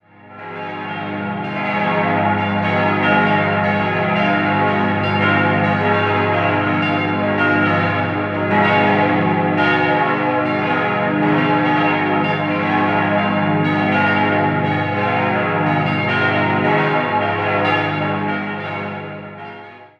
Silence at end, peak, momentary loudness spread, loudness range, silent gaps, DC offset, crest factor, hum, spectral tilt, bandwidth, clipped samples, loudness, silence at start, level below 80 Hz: 0.15 s; -2 dBFS; 9 LU; 2 LU; none; under 0.1%; 16 dB; 50 Hz at -30 dBFS; -8 dB/octave; 7 kHz; under 0.1%; -17 LUFS; 0.25 s; -58 dBFS